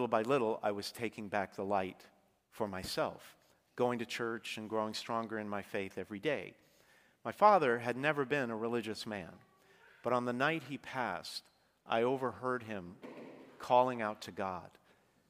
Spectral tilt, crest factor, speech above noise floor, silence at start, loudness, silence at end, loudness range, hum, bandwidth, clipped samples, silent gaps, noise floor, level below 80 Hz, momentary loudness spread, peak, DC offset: -5 dB/octave; 24 dB; 34 dB; 0 s; -36 LUFS; 0.6 s; 6 LU; none; 15.5 kHz; under 0.1%; none; -70 dBFS; -74 dBFS; 15 LU; -12 dBFS; under 0.1%